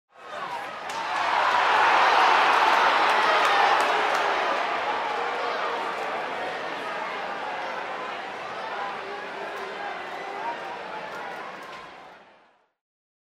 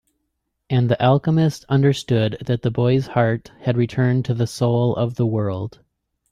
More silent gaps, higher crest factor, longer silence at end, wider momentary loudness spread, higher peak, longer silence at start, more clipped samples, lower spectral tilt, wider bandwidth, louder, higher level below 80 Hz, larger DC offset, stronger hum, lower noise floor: neither; about the same, 20 dB vs 16 dB; first, 1.2 s vs 0.6 s; first, 16 LU vs 6 LU; about the same, -6 dBFS vs -4 dBFS; second, 0.2 s vs 0.7 s; neither; second, -1.5 dB/octave vs -7.5 dB/octave; first, 15.5 kHz vs 11.5 kHz; second, -24 LUFS vs -20 LUFS; second, -72 dBFS vs -52 dBFS; neither; neither; second, -60 dBFS vs -75 dBFS